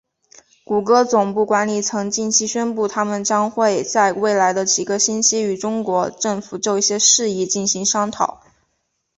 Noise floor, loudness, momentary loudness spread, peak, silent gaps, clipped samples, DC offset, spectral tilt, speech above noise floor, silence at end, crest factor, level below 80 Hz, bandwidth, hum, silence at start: -71 dBFS; -18 LUFS; 7 LU; 0 dBFS; none; under 0.1%; under 0.1%; -2.5 dB/octave; 53 dB; 0.85 s; 18 dB; -62 dBFS; 8.4 kHz; none; 0.7 s